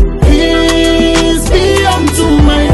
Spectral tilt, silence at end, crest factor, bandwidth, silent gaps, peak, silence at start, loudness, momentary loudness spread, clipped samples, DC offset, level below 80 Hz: -5 dB/octave; 0 s; 8 dB; 12.5 kHz; none; 0 dBFS; 0 s; -9 LUFS; 2 LU; under 0.1%; under 0.1%; -14 dBFS